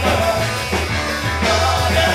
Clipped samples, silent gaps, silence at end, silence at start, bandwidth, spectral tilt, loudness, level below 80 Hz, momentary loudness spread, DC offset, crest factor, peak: under 0.1%; none; 0 s; 0 s; 16 kHz; -4 dB/octave; -17 LUFS; -28 dBFS; 4 LU; under 0.1%; 14 dB; -4 dBFS